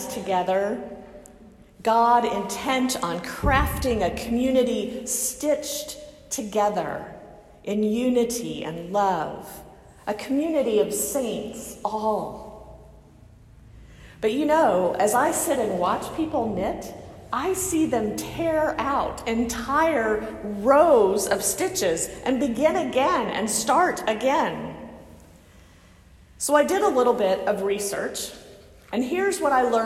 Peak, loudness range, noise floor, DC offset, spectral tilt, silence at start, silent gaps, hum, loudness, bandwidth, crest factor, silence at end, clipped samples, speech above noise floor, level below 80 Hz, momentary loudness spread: -6 dBFS; 5 LU; -51 dBFS; under 0.1%; -4 dB/octave; 0 s; none; none; -23 LUFS; 16 kHz; 18 dB; 0 s; under 0.1%; 28 dB; -44 dBFS; 13 LU